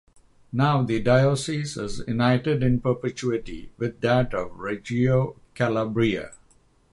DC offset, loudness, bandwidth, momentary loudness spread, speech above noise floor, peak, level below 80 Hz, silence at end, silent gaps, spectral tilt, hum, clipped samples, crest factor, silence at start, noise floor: under 0.1%; -24 LUFS; 11.5 kHz; 11 LU; 36 dB; -6 dBFS; -46 dBFS; 0.55 s; none; -6.5 dB/octave; none; under 0.1%; 18 dB; 0.55 s; -59 dBFS